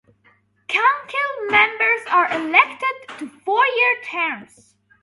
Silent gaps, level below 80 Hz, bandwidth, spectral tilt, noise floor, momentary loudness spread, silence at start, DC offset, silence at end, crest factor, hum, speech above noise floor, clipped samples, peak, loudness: none; -66 dBFS; 11.5 kHz; -3 dB/octave; -58 dBFS; 10 LU; 0.7 s; under 0.1%; 0.6 s; 20 dB; none; 39 dB; under 0.1%; 0 dBFS; -18 LUFS